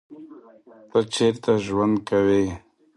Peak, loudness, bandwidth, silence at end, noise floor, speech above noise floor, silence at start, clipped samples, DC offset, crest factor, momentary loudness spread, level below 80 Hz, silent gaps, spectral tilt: -6 dBFS; -22 LUFS; 11.5 kHz; 0.4 s; -45 dBFS; 23 dB; 0.1 s; under 0.1%; under 0.1%; 16 dB; 6 LU; -52 dBFS; none; -5.5 dB/octave